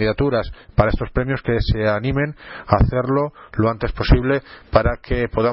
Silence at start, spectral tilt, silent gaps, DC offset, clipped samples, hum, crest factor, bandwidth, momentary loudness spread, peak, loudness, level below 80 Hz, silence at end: 0 s; -11.5 dB/octave; none; under 0.1%; under 0.1%; none; 18 dB; 5.8 kHz; 6 LU; 0 dBFS; -20 LUFS; -26 dBFS; 0 s